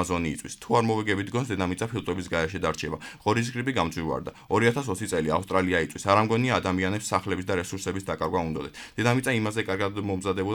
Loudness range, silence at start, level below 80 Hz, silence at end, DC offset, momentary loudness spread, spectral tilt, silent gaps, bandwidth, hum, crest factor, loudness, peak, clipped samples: 3 LU; 0 s; -52 dBFS; 0 s; under 0.1%; 8 LU; -5 dB/octave; none; 18 kHz; none; 20 dB; -27 LUFS; -6 dBFS; under 0.1%